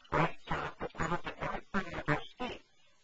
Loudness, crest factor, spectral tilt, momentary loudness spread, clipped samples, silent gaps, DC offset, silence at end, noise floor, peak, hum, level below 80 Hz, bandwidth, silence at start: -37 LUFS; 22 dB; -4.5 dB/octave; 9 LU; under 0.1%; none; under 0.1%; 0.4 s; -56 dBFS; -14 dBFS; none; -52 dBFS; 8 kHz; 0.05 s